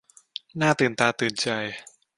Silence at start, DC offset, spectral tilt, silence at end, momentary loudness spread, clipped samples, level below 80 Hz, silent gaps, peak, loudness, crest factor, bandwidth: 0.55 s; under 0.1%; -4 dB/octave; 0.35 s; 17 LU; under 0.1%; -64 dBFS; none; -4 dBFS; -24 LUFS; 22 dB; 11.5 kHz